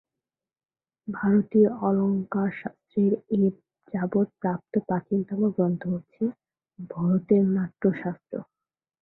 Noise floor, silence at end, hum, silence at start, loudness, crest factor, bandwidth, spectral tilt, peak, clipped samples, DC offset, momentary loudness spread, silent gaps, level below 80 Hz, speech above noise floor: under -90 dBFS; 0.6 s; none; 1.05 s; -26 LUFS; 18 dB; 3.9 kHz; -13 dB/octave; -8 dBFS; under 0.1%; under 0.1%; 14 LU; none; -66 dBFS; over 65 dB